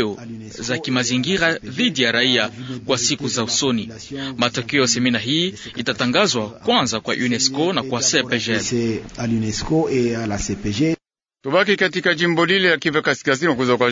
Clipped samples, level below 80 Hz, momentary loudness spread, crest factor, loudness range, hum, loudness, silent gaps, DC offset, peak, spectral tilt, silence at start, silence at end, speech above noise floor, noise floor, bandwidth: under 0.1%; -46 dBFS; 9 LU; 18 dB; 2 LU; none; -19 LUFS; none; under 0.1%; -2 dBFS; -3.5 dB/octave; 0 s; 0 s; 39 dB; -59 dBFS; 7.8 kHz